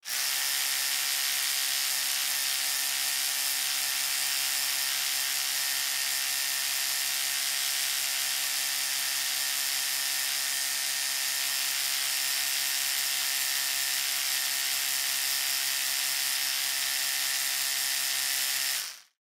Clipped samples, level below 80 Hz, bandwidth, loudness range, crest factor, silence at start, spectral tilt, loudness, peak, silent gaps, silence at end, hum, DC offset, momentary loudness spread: under 0.1%; -84 dBFS; 16 kHz; 1 LU; 16 dB; 0.05 s; 4 dB/octave; -26 LUFS; -14 dBFS; none; 0.2 s; none; under 0.1%; 1 LU